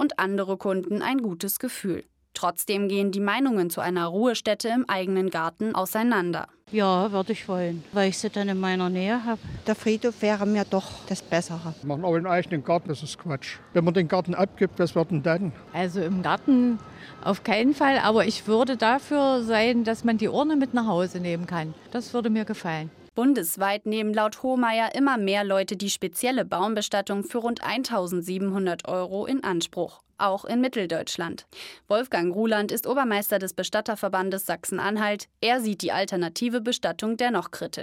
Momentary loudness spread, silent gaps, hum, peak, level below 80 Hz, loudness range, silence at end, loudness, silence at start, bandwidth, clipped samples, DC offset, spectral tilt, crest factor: 8 LU; none; none; -8 dBFS; -62 dBFS; 4 LU; 0 s; -25 LUFS; 0 s; 16.5 kHz; under 0.1%; under 0.1%; -5 dB/octave; 18 dB